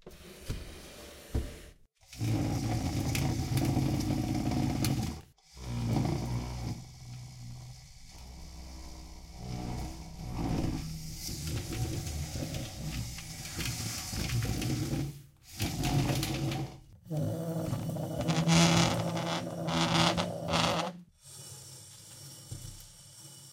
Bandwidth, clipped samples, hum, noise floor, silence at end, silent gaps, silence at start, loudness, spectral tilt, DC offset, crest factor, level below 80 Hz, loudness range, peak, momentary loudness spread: 16.5 kHz; under 0.1%; none; -56 dBFS; 0 s; none; 0.05 s; -33 LUFS; -5 dB/octave; under 0.1%; 24 dB; -46 dBFS; 11 LU; -10 dBFS; 19 LU